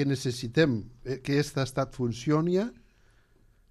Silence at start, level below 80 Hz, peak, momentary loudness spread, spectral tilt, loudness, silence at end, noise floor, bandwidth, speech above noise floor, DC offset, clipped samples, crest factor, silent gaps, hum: 0 s; -56 dBFS; -10 dBFS; 9 LU; -6 dB/octave; -29 LUFS; 1 s; -62 dBFS; 13 kHz; 34 dB; under 0.1%; under 0.1%; 20 dB; none; none